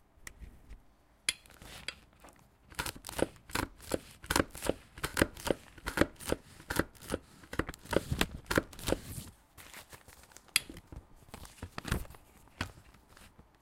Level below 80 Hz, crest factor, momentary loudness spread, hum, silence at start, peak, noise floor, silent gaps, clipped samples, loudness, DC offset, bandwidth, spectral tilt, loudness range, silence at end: -50 dBFS; 34 dB; 21 LU; none; 0.2 s; -4 dBFS; -63 dBFS; none; under 0.1%; -36 LUFS; under 0.1%; 17 kHz; -3.5 dB/octave; 5 LU; 0.35 s